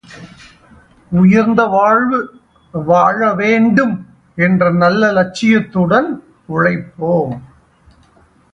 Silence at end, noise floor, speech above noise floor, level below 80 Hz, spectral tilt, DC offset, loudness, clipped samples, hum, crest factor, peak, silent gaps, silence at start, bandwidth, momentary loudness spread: 1.1 s; -50 dBFS; 37 dB; -48 dBFS; -7.5 dB/octave; under 0.1%; -13 LUFS; under 0.1%; none; 14 dB; 0 dBFS; none; 0.1 s; 8 kHz; 12 LU